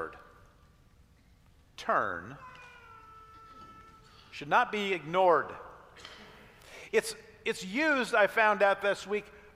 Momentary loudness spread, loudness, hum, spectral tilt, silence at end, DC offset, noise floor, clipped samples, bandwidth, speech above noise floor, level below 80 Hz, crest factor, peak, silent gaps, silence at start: 25 LU; -29 LUFS; none; -3.5 dB/octave; 0.2 s; under 0.1%; -61 dBFS; under 0.1%; 15.5 kHz; 33 dB; -64 dBFS; 22 dB; -12 dBFS; none; 0 s